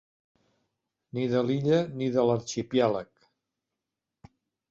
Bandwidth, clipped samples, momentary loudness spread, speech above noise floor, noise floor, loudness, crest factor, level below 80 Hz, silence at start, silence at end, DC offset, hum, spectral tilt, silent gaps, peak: 7.8 kHz; under 0.1%; 7 LU; 61 dB; -87 dBFS; -27 LUFS; 20 dB; -66 dBFS; 1.15 s; 1.65 s; under 0.1%; none; -6.5 dB/octave; none; -10 dBFS